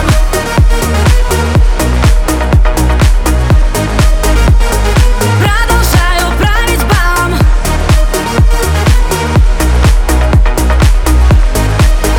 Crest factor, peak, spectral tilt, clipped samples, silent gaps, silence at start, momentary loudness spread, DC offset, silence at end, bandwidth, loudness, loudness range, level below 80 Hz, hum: 8 dB; 0 dBFS; -5 dB/octave; under 0.1%; none; 0 s; 2 LU; under 0.1%; 0 s; 17.5 kHz; -10 LUFS; 1 LU; -8 dBFS; none